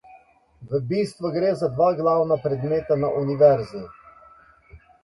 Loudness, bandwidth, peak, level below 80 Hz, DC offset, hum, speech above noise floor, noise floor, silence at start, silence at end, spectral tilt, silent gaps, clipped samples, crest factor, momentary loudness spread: -22 LUFS; 11.5 kHz; -4 dBFS; -56 dBFS; under 0.1%; none; 32 dB; -53 dBFS; 0.1 s; 0.25 s; -8 dB/octave; none; under 0.1%; 20 dB; 11 LU